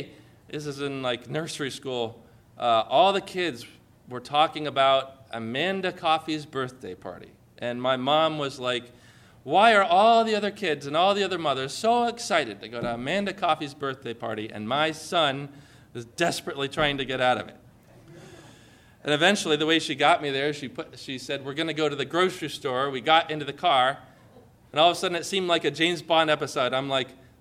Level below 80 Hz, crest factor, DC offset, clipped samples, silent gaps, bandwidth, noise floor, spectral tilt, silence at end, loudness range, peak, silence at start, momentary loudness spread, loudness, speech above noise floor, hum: -62 dBFS; 20 dB; under 0.1%; under 0.1%; none; 15 kHz; -54 dBFS; -4 dB/octave; 0.25 s; 6 LU; -6 dBFS; 0 s; 15 LU; -25 LUFS; 28 dB; none